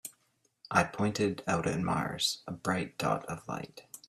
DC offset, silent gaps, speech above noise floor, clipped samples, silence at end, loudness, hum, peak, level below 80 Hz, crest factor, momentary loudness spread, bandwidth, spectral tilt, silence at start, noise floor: under 0.1%; none; 42 dB; under 0.1%; 0.1 s; -32 LUFS; none; -10 dBFS; -64 dBFS; 24 dB; 11 LU; 15 kHz; -4.5 dB/octave; 0.05 s; -74 dBFS